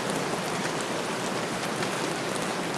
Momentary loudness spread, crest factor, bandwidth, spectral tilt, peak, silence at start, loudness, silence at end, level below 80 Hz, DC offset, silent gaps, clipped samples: 1 LU; 18 dB; 14 kHz; -3.5 dB/octave; -12 dBFS; 0 s; -29 LUFS; 0 s; -64 dBFS; under 0.1%; none; under 0.1%